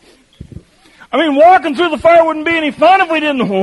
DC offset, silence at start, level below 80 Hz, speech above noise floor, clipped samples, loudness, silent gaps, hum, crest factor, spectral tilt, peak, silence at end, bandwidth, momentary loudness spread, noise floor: under 0.1%; 0.4 s; -46 dBFS; 33 dB; under 0.1%; -11 LUFS; none; none; 12 dB; -5.5 dB/octave; 0 dBFS; 0 s; 11.5 kHz; 7 LU; -44 dBFS